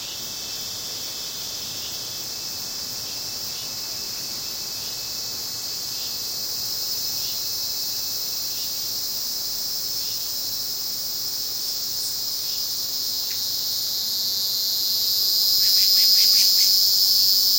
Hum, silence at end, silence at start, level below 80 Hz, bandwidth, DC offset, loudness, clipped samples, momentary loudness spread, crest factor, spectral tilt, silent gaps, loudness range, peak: none; 0 s; 0 s; -60 dBFS; 16.5 kHz; under 0.1%; -21 LUFS; under 0.1%; 13 LU; 22 dB; 1 dB/octave; none; 11 LU; -2 dBFS